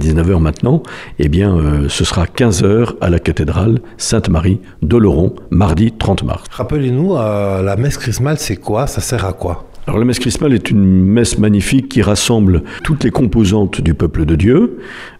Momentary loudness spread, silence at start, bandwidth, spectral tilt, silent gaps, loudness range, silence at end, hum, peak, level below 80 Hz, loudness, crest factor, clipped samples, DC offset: 7 LU; 0 s; 15 kHz; -6 dB/octave; none; 4 LU; 0.1 s; none; 0 dBFS; -26 dBFS; -13 LUFS; 12 dB; under 0.1%; under 0.1%